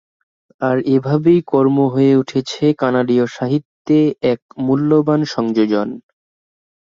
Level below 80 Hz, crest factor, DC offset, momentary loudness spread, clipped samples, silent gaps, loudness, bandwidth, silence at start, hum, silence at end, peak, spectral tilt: -58 dBFS; 14 dB; under 0.1%; 7 LU; under 0.1%; 3.65-3.85 s, 4.42-4.49 s; -16 LUFS; 7.6 kHz; 0.6 s; none; 0.85 s; -2 dBFS; -7.5 dB/octave